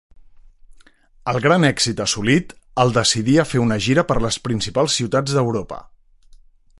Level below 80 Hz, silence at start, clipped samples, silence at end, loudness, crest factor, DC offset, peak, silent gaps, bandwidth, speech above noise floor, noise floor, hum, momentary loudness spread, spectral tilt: -42 dBFS; 0.7 s; under 0.1%; 0.95 s; -18 LUFS; 18 dB; under 0.1%; -2 dBFS; none; 11.5 kHz; 31 dB; -49 dBFS; none; 9 LU; -4.5 dB/octave